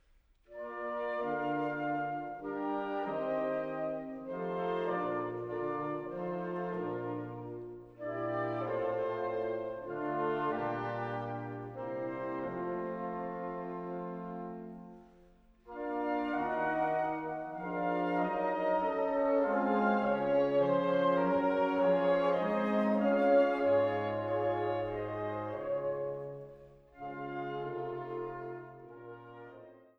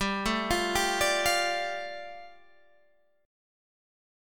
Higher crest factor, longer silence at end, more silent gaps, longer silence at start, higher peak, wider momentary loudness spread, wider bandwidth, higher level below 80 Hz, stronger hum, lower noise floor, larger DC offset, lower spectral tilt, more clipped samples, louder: about the same, 18 dB vs 18 dB; second, 0.2 s vs 1 s; neither; first, 0.5 s vs 0 s; second, -16 dBFS vs -12 dBFS; about the same, 15 LU vs 16 LU; second, 6 kHz vs 18 kHz; second, -66 dBFS vs -50 dBFS; neither; about the same, -66 dBFS vs -68 dBFS; second, under 0.1% vs 0.3%; first, -8.5 dB/octave vs -2.5 dB/octave; neither; second, -34 LUFS vs -27 LUFS